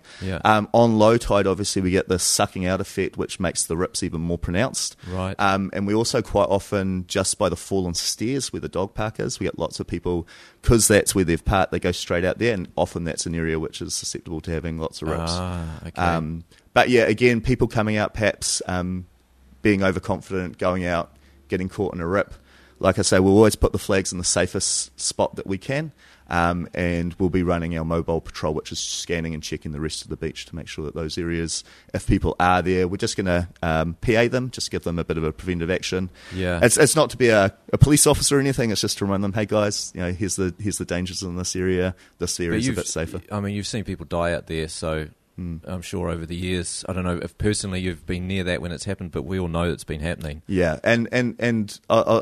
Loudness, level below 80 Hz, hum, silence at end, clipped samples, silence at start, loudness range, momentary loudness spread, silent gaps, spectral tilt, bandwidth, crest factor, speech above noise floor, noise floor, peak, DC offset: -23 LUFS; -40 dBFS; none; 0 s; under 0.1%; 0.1 s; 7 LU; 12 LU; none; -4.5 dB/octave; 13.5 kHz; 22 dB; 31 dB; -53 dBFS; 0 dBFS; under 0.1%